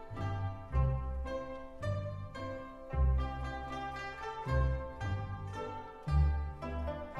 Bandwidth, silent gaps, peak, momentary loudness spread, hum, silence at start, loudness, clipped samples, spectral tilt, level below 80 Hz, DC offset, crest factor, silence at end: 7.4 kHz; none; -20 dBFS; 10 LU; none; 0 s; -37 LUFS; under 0.1%; -7.5 dB/octave; -38 dBFS; under 0.1%; 16 dB; 0 s